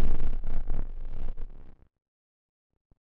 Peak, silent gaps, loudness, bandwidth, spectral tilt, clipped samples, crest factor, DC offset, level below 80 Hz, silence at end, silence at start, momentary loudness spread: -10 dBFS; none; -38 LUFS; 1.7 kHz; -9 dB/octave; under 0.1%; 12 dB; under 0.1%; -28 dBFS; 1.3 s; 0 s; 17 LU